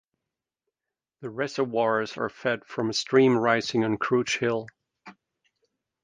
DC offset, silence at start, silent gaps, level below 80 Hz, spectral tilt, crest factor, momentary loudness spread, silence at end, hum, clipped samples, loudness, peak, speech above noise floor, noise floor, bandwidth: under 0.1%; 1.2 s; none; -68 dBFS; -5 dB/octave; 20 dB; 11 LU; 0.9 s; none; under 0.1%; -25 LUFS; -6 dBFS; 64 dB; -89 dBFS; 9.6 kHz